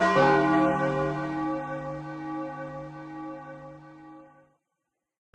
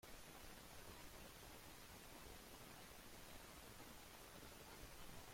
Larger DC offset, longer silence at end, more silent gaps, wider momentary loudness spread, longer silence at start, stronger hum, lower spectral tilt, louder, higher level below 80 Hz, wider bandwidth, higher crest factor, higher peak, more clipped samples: neither; first, 1.1 s vs 0 s; neither; first, 24 LU vs 1 LU; about the same, 0 s vs 0 s; neither; first, -7 dB/octave vs -3 dB/octave; first, -27 LUFS vs -59 LUFS; first, -58 dBFS vs -68 dBFS; second, 9.4 kHz vs 16.5 kHz; about the same, 20 dB vs 16 dB; first, -8 dBFS vs -44 dBFS; neither